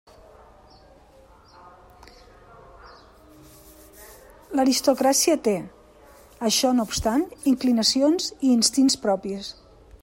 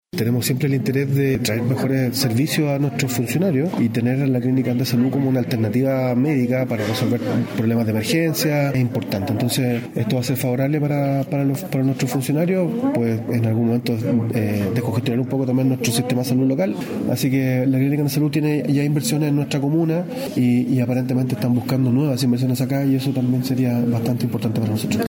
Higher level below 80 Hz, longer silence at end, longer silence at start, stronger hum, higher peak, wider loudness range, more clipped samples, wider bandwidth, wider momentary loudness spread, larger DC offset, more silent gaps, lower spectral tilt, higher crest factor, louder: first, -52 dBFS vs -58 dBFS; first, 0.5 s vs 0.05 s; first, 2.85 s vs 0.15 s; neither; about the same, -6 dBFS vs -6 dBFS; first, 5 LU vs 1 LU; neither; about the same, 16.5 kHz vs 17 kHz; first, 10 LU vs 3 LU; neither; neither; second, -3 dB/octave vs -6.5 dB/octave; first, 20 dB vs 12 dB; about the same, -22 LUFS vs -20 LUFS